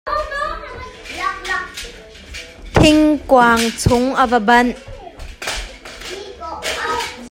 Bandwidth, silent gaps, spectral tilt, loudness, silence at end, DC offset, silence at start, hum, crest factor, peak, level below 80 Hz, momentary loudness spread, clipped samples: 16.5 kHz; none; -4.5 dB/octave; -16 LUFS; 0.05 s; under 0.1%; 0.05 s; none; 18 dB; 0 dBFS; -34 dBFS; 21 LU; under 0.1%